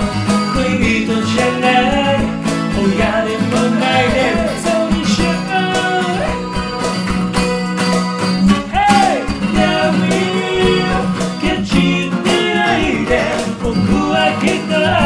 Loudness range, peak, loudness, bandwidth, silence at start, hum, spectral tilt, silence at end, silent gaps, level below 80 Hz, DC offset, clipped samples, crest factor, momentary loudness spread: 2 LU; 0 dBFS; -15 LUFS; 11 kHz; 0 s; none; -5 dB/octave; 0 s; none; -32 dBFS; 0.6%; under 0.1%; 14 dB; 5 LU